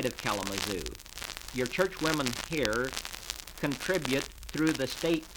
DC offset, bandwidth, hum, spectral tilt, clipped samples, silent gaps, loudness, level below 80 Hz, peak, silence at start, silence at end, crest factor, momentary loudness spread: under 0.1%; over 20 kHz; none; -3.5 dB/octave; under 0.1%; none; -32 LUFS; -50 dBFS; -6 dBFS; 0 s; 0 s; 26 dB; 9 LU